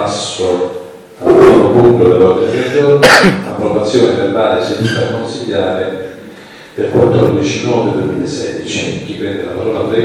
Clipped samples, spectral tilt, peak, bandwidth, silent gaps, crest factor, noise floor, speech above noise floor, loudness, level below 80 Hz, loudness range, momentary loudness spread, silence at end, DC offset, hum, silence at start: 0.1%; -5.5 dB/octave; 0 dBFS; 15.5 kHz; none; 12 dB; -33 dBFS; 22 dB; -11 LUFS; -44 dBFS; 6 LU; 14 LU; 0 s; under 0.1%; none; 0 s